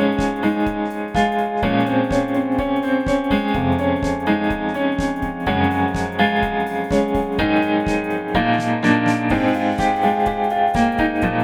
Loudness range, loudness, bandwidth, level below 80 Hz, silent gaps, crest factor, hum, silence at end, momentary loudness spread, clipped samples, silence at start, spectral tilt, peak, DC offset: 2 LU; -19 LUFS; 17.5 kHz; -36 dBFS; none; 16 dB; none; 0 s; 4 LU; under 0.1%; 0 s; -6.5 dB/octave; -2 dBFS; under 0.1%